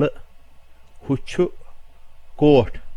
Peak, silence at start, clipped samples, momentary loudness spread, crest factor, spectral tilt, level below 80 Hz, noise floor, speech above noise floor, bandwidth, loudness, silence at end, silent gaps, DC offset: -2 dBFS; 0 s; under 0.1%; 11 LU; 20 dB; -7.5 dB/octave; -38 dBFS; -43 dBFS; 25 dB; 10.5 kHz; -20 LUFS; 0 s; none; under 0.1%